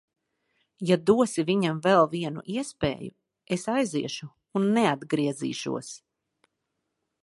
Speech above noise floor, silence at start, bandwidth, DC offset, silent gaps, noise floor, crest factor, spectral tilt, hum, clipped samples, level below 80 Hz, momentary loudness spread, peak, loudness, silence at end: 55 dB; 0.8 s; 11.5 kHz; under 0.1%; none; -81 dBFS; 20 dB; -5.5 dB/octave; none; under 0.1%; -60 dBFS; 13 LU; -8 dBFS; -26 LUFS; 1.25 s